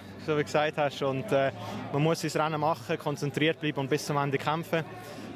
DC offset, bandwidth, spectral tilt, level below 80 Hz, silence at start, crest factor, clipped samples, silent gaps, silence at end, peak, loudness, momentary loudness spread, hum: under 0.1%; 16 kHz; -5.5 dB/octave; -66 dBFS; 0 s; 18 dB; under 0.1%; none; 0 s; -12 dBFS; -29 LUFS; 5 LU; none